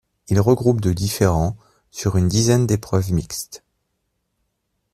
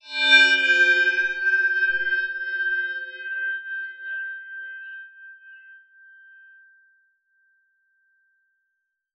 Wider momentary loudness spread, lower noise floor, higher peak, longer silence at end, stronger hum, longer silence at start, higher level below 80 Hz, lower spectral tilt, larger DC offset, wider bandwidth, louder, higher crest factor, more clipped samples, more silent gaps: second, 13 LU vs 21 LU; second, -73 dBFS vs -78 dBFS; about the same, -2 dBFS vs -2 dBFS; second, 1.35 s vs 3.4 s; neither; first, 0.3 s vs 0.05 s; first, -42 dBFS vs -70 dBFS; first, -6 dB/octave vs 1.5 dB/octave; neither; first, 14 kHz vs 8.2 kHz; about the same, -19 LUFS vs -20 LUFS; second, 18 dB vs 24 dB; neither; neither